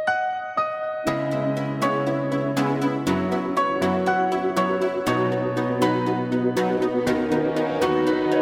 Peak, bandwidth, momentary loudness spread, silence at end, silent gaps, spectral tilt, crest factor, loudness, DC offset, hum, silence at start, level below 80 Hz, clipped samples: -6 dBFS; 17 kHz; 4 LU; 0 s; none; -6.5 dB/octave; 16 dB; -23 LUFS; under 0.1%; none; 0 s; -56 dBFS; under 0.1%